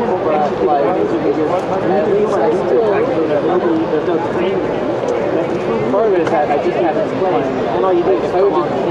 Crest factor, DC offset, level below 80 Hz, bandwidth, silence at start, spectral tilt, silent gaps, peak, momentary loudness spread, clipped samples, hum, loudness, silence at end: 12 dB; under 0.1%; -46 dBFS; 9 kHz; 0 s; -7 dB/octave; none; -2 dBFS; 3 LU; under 0.1%; none; -15 LUFS; 0 s